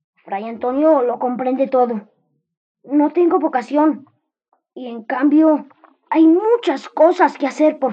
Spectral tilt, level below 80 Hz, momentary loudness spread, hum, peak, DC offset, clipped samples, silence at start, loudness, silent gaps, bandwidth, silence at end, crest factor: -6 dB/octave; -74 dBFS; 14 LU; none; -2 dBFS; under 0.1%; under 0.1%; 0.25 s; -16 LUFS; 2.57-2.75 s; 7.8 kHz; 0 s; 16 dB